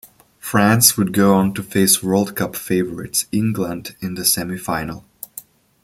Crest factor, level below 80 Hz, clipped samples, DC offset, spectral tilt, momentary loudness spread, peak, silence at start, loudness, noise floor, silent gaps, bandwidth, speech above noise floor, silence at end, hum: 18 dB; -52 dBFS; under 0.1%; under 0.1%; -4 dB/octave; 20 LU; 0 dBFS; 0.45 s; -17 LUFS; -41 dBFS; none; 16.5 kHz; 23 dB; 0.45 s; none